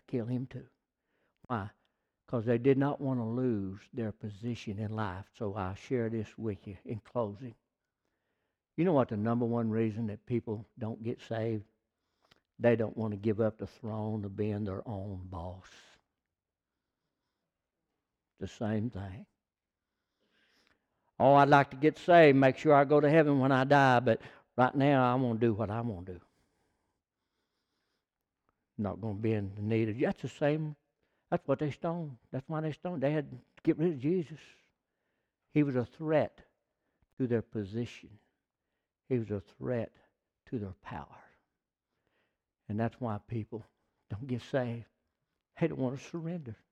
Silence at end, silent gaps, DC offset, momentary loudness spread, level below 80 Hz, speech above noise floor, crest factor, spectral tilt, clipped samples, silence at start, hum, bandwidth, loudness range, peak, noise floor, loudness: 0.2 s; 37.13-37.17 s; under 0.1%; 19 LU; -68 dBFS; over 59 dB; 24 dB; -8 dB/octave; under 0.1%; 0.1 s; none; 9.2 kHz; 17 LU; -10 dBFS; under -90 dBFS; -31 LUFS